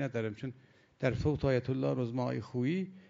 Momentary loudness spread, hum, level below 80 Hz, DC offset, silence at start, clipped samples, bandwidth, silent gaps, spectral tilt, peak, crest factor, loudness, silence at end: 7 LU; none; -54 dBFS; under 0.1%; 0 s; under 0.1%; 7.6 kHz; none; -8 dB/octave; -16 dBFS; 18 dB; -34 LUFS; 0.1 s